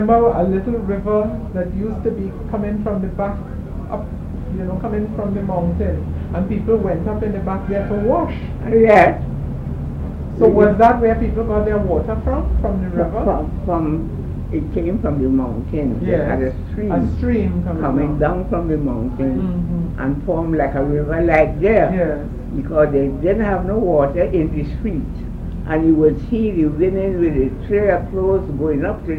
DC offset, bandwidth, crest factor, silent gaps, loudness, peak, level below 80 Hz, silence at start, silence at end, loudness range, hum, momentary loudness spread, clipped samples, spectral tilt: under 0.1%; 7.4 kHz; 18 dB; none; -18 LUFS; 0 dBFS; -28 dBFS; 0 s; 0 s; 6 LU; none; 11 LU; under 0.1%; -10 dB/octave